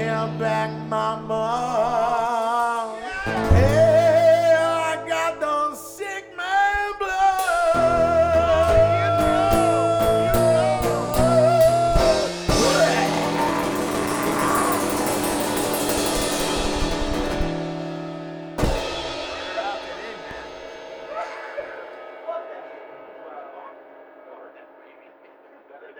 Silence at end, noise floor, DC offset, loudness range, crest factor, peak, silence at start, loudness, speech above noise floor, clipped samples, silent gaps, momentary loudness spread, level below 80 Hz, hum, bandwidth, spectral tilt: 0 s; -50 dBFS; under 0.1%; 16 LU; 18 dB; -4 dBFS; 0 s; -21 LUFS; 25 dB; under 0.1%; none; 17 LU; -36 dBFS; none; over 20 kHz; -4.5 dB/octave